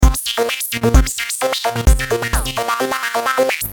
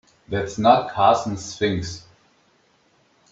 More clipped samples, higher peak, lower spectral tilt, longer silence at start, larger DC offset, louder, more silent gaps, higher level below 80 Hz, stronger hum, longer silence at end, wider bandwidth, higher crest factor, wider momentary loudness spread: neither; about the same, 0 dBFS vs -2 dBFS; about the same, -4 dB/octave vs -5 dB/octave; second, 0 s vs 0.3 s; neither; first, -17 LUFS vs -21 LUFS; neither; first, -20 dBFS vs -54 dBFS; neither; second, 0 s vs 1.35 s; first, 19.5 kHz vs 8 kHz; about the same, 16 dB vs 20 dB; second, 4 LU vs 13 LU